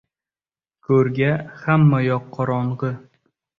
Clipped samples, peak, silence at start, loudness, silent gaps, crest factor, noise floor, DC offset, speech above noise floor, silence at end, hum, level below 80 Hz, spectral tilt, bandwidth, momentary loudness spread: under 0.1%; -4 dBFS; 0.9 s; -20 LUFS; none; 16 dB; under -90 dBFS; under 0.1%; over 71 dB; 0.6 s; none; -54 dBFS; -10 dB/octave; 5.6 kHz; 11 LU